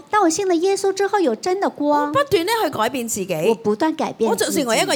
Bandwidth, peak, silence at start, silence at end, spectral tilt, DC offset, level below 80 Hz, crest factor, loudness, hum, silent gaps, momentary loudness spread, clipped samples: 19 kHz; -6 dBFS; 0.1 s; 0 s; -3.5 dB/octave; under 0.1%; -58 dBFS; 14 dB; -19 LUFS; none; none; 4 LU; under 0.1%